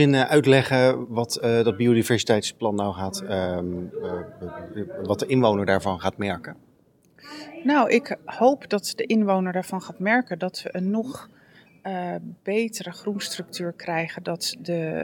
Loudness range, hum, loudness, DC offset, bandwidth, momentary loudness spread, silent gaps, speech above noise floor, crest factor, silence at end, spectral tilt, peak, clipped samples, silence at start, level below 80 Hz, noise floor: 7 LU; none; -24 LUFS; under 0.1%; 18 kHz; 14 LU; none; 35 dB; 20 dB; 0 s; -5.5 dB/octave; -4 dBFS; under 0.1%; 0 s; -66 dBFS; -59 dBFS